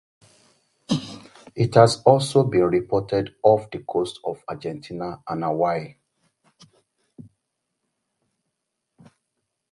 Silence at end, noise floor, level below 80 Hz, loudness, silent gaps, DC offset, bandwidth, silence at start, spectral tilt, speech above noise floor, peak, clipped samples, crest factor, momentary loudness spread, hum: 3.85 s; -79 dBFS; -56 dBFS; -22 LUFS; none; under 0.1%; 11.5 kHz; 0.9 s; -6.5 dB/octave; 59 dB; 0 dBFS; under 0.1%; 24 dB; 16 LU; none